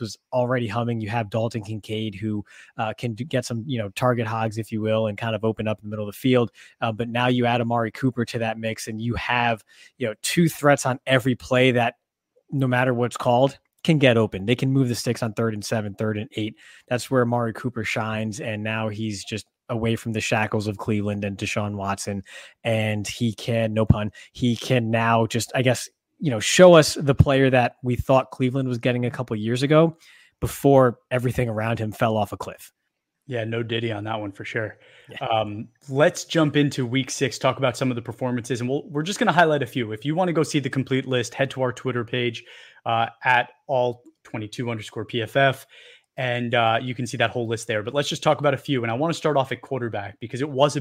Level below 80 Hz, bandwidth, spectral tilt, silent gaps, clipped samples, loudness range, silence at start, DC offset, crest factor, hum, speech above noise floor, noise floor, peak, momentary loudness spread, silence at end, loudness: -48 dBFS; 16 kHz; -5.5 dB/octave; none; under 0.1%; 7 LU; 0 s; under 0.1%; 22 dB; none; 55 dB; -78 dBFS; -2 dBFS; 11 LU; 0 s; -23 LUFS